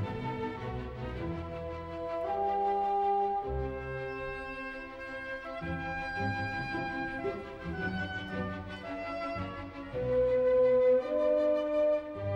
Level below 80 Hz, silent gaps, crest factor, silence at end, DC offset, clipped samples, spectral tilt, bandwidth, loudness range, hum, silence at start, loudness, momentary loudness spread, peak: -50 dBFS; none; 14 dB; 0 s; under 0.1%; under 0.1%; -7.5 dB/octave; 7.6 kHz; 8 LU; none; 0 s; -33 LUFS; 13 LU; -18 dBFS